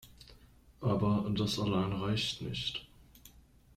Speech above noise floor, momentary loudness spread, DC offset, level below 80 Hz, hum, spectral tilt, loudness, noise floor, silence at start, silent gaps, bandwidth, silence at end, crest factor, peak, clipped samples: 28 dB; 7 LU; under 0.1%; -56 dBFS; none; -6 dB/octave; -33 LUFS; -60 dBFS; 0.05 s; none; 15 kHz; 0.5 s; 16 dB; -18 dBFS; under 0.1%